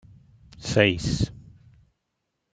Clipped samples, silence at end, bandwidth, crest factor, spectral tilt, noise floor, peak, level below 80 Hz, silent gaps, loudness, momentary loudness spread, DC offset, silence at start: under 0.1%; 1.15 s; 9.4 kHz; 26 dB; -5 dB/octave; -79 dBFS; -2 dBFS; -46 dBFS; none; -24 LUFS; 11 LU; under 0.1%; 0.6 s